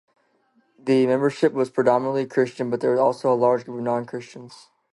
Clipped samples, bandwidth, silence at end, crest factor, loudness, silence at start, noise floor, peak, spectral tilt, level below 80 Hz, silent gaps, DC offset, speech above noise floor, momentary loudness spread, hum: under 0.1%; 11.5 kHz; 0.4 s; 18 dB; -22 LUFS; 0.85 s; -64 dBFS; -6 dBFS; -7 dB/octave; -74 dBFS; none; under 0.1%; 43 dB; 14 LU; none